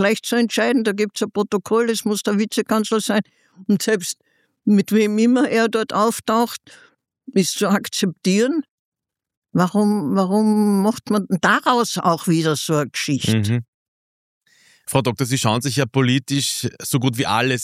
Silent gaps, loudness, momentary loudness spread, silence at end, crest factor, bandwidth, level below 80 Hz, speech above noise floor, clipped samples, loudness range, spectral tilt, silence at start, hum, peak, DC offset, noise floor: 8.70-8.92 s, 9.37-9.42 s, 13.68-14.41 s; -19 LUFS; 6 LU; 0 s; 18 dB; 16 kHz; -62 dBFS; over 71 dB; under 0.1%; 3 LU; -5 dB/octave; 0 s; none; -2 dBFS; under 0.1%; under -90 dBFS